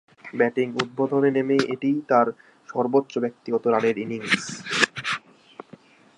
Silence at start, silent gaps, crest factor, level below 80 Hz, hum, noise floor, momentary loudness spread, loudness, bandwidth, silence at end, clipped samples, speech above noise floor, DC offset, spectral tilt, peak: 0.25 s; none; 22 dB; -72 dBFS; none; -50 dBFS; 8 LU; -23 LUFS; 11.5 kHz; 1 s; under 0.1%; 27 dB; under 0.1%; -4.5 dB/octave; -2 dBFS